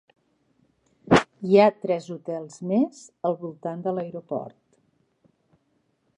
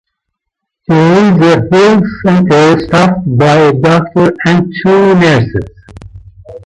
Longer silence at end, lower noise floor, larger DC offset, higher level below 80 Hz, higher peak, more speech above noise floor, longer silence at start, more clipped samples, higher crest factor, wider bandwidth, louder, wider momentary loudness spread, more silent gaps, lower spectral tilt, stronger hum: first, 1.7 s vs 0.05 s; second, -70 dBFS vs -75 dBFS; neither; second, -58 dBFS vs -38 dBFS; about the same, -2 dBFS vs 0 dBFS; second, 46 dB vs 67 dB; first, 1.1 s vs 0.9 s; neither; first, 24 dB vs 8 dB; about the same, 10.5 kHz vs 10.5 kHz; second, -24 LUFS vs -8 LUFS; first, 15 LU vs 5 LU; neither; about the same, -6.5 dB/octave vs -7 dB/octave; neither